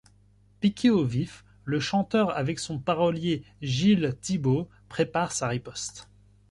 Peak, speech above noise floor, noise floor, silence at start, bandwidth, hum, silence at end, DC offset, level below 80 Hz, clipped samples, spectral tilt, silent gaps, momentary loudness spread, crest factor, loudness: -10 dBFS; 33 dB; -59 dBFS; 0.6 s; 11.5 kHz; 50 Hz at -50 dBFS; 0.45 s; under 0.1%; -56 dBFS; under 0.1%; -5.5 dB/octave; none; 12 LU; 16 dB; -27 LUFS